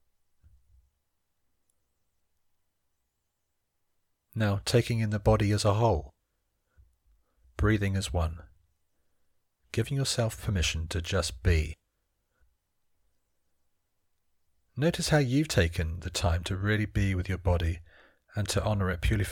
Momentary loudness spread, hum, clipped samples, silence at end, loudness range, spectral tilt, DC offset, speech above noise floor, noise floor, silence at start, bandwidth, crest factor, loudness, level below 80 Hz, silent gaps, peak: 10 LU; none; under 0.1%; 0 s; 6 LU; -5.5 dB/octave; under 0.1%; 52 dB; -79 dBFS; 4.35 s; 17 kHz; 20 dB; -29 LUFS; -40 dBFS; none; -10 dBFS